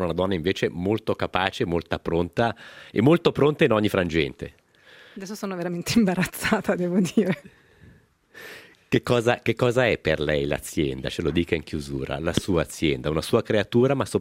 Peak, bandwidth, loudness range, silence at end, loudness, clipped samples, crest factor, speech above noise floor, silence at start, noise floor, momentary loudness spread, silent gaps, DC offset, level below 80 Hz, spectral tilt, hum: -2 dBFS; 16 kHz; 3 LU; 0 s; -24 LUFS; under 0.1%; 22 dB; 31 dB; 0 s; -55 dBFS; 11 LU; none; under 0.1%; -48 dBFS; -6 dB/octave; none